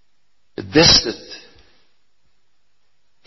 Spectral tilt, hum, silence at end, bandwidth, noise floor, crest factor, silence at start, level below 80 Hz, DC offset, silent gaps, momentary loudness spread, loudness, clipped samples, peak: -2 dB/octave; 50 Hz at -55 dBFS; 1.9 s; 7.4 kHz; -70 dBFS; 22 dB; 0.6 s; -42 dBFS; 0.3%; none; 27 LU; -13 LUFS; under 0.1%; 0 dBFS